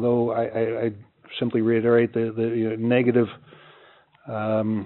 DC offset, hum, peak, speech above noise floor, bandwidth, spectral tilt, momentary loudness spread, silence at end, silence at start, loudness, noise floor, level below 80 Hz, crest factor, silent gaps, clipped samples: under 0.1%; none; -6 dBFS; 32 dB; 4.2 kHz; -6.5 dB/octave; 10 LU; 0 s; 0 s; -23 LUFS; -54 dBFS; -68 dBFS; 18 dB; none; under 0.1%